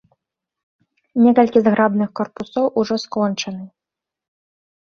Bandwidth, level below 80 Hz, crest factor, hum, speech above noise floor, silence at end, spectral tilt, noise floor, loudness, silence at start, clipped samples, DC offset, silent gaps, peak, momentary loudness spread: 6.8 kHz; -62 dBFS; 18 dB; none; 69 dB; 1.2 s; -6 dB/octave; -86 dBFS; -18 LUFS; 1.15 s; under 0.1%; under 0.1%; none; -2 dBFS; 13 LU